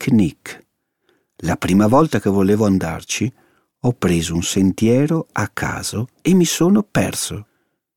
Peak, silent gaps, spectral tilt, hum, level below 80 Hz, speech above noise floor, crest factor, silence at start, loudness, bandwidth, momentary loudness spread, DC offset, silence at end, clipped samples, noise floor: -2 dBFS; none; -5.5 dB/octave; none; -44 dBFS; 48 dB; 16 dB; 0 s; -18 LUFS; 17 kHz; 10 LU; under 0.1%; 0.55 s; under 0.1%; -65 dBFS